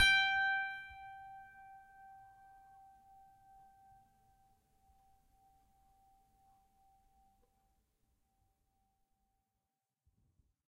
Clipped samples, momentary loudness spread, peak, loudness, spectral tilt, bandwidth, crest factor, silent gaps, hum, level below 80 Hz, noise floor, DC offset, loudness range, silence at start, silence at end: under 0.1%; 29 LU; -16 dBFS; -33 LUFS; 0.5 dB/octave; 14 kHz; 26 dB; none; none; -66 dBFS; -90 dBFS; under 0.1%; 27 LU; 0 s; 8.95 s